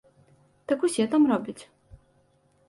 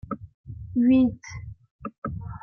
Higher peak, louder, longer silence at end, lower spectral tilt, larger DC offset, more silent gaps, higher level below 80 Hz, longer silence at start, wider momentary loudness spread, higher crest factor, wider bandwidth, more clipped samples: about the same, -12 dBFS vs -12 dBFS; about the same, -24 LUFS vs -24 LUFS; first, 1.05 s vs 0.05 s; second, -5 dB/octave vs -8 dB/octave; neither; second, none vs 0.34-0.44 s, 1.70-1.79 s, 1.98-2.02 s; second, -64 dBFS vs -48 dBFS; first, 0.7 s vs 0.05 s; about the same, 22 LU vs 22 LU; about the same, 16 dB vs 16 dB; first, 11.5 kHz vs 6.4 kHz; neither